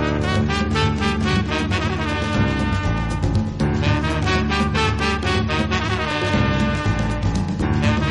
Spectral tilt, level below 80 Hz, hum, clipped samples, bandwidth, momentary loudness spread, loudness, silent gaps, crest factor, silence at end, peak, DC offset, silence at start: -6 dB/octave; -28 dBFS; none; under 0.1%; 11.5 kHz; 3 LU; -20 LUFS; none; 14 dB; 0 s; -6 dBFS; under 0.1%; 0 s